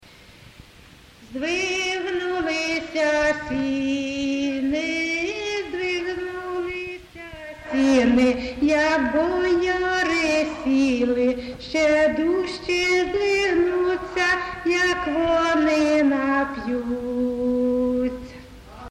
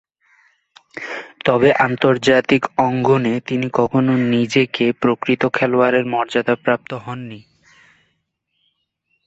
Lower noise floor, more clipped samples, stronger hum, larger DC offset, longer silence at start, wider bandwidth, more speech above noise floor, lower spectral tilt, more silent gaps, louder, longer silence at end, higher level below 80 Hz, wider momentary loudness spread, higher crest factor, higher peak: second, -48 dBFS vs -70 dBFS; neither; neither; neither; first, 1.2 s vs 0.95 s; first, 11.5 kHz vs 8 kHz; second, 28 dB vs 54 dB; second, -4 dB/octave vs -6.5 dB/octave; neither; second, -22 LUFS vs -17 LUFS; second, 0 s vs 1.85 s; first, -46 dBFS vs -56 dBFS; second, 9 LU vs 14 LU; about the same, 14 dB vs 18 dB; second, -8 dBFS vs -2 dBFS